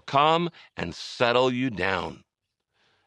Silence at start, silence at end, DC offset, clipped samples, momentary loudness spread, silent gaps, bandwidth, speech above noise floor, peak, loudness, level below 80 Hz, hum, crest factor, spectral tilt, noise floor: 0.05 s; 0.9 s; under 0.1%; under 0.1%; 13 LU; none; 10 kHz; 57 dB; -6 dBFS; -25 LUFS; -60 dBFS; none; 22 dB; -5.5 dB/octave; -82 dBFS